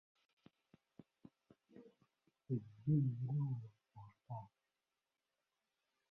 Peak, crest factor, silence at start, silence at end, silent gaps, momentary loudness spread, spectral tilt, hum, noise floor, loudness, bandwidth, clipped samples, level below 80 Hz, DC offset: -26 dBFS; 20 dB; 1.75 s; 1.65 s; none; 27 LU; -12.5 dB/octave; none; under -90 dBFS; -42 LUFS; 3.1 kHz; under 0.1%; -78 dBFS; under 0.1%